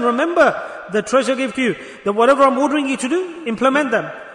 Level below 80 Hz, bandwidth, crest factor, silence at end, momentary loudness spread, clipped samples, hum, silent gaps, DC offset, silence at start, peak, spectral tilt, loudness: -58 dBFS; 11 kHz; 14 dB; 0 s; 9 LU; under 0.1%; none; none; under 0.1%; 0 s; -2 dBFS; -4 dB/octave; -17 LUFS